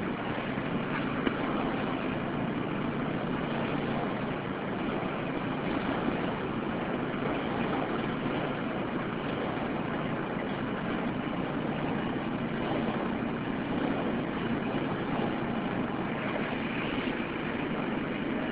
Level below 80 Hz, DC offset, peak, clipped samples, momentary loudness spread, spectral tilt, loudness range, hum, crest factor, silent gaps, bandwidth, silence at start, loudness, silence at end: -52 dBFS; under 0.1%; -12 dBFS; under 0.1%; 2 LU; -5 dB/octave; 1 LU; none; 20 dB; none; 4 kHz; 0 s; -32 LUFS; 0 s